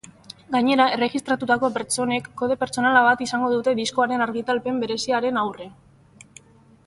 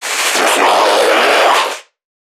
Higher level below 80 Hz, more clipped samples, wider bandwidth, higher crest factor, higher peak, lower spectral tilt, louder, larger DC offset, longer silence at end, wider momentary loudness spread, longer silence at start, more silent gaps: about the same, -62 dBFS vs -66 dBFS; neither; second, 11.5 kHz vs 19 kHz; first, 18 dB vs 12 dB; second, -4 dBFS vs 0 dBFS; first, -3.5 dB/octave vs 0.5 dB/octave; second, -22 LUFS vs -11 LUFS; neither; first, 1.15 s vs 0.4 s; about the same, 8 LU vs 6 LU; first, 0.5 s vs 0 s; neither